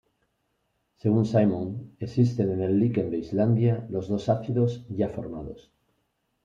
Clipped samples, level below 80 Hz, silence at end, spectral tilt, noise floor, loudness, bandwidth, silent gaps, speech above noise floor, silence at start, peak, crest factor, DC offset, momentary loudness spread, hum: under 0.1%; -58 dBFS; 0.85 s; -9.5 dB/octave; -75 dBFS; -26 LUFS; 7.2 kHz; none; 50 dB; 1.05 s; -8 dBFS; 18 dB; under 0.1%; 13 LU; none